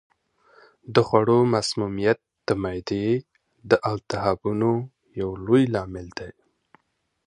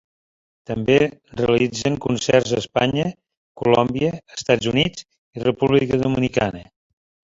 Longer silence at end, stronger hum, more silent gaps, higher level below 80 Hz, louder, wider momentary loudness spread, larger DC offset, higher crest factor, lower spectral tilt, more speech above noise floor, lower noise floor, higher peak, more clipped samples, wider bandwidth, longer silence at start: first, 0.95 s vs 0.75 s; neither; second, none vs 3.37-3.55 s, 5.18-5.33 s; about the same, -52 dBFS vs -48 dBFS; second, -23 LUFS vs -20 LUFS; first, 14 LU vs 8 LU; neither; about the same, 22 dB vs 20 dB; about the same, -6.5 dB/octave vs -5.5 dB/octave; second, 51 dB vs over 71 dB; second, -74 dBFS vs under -90 dBFS; about the same, -2 dBFS vs -2 dBFS; neither; first, 10.5 kHz vs 7.8 kHz; first, 0.9 s vs 0.7 s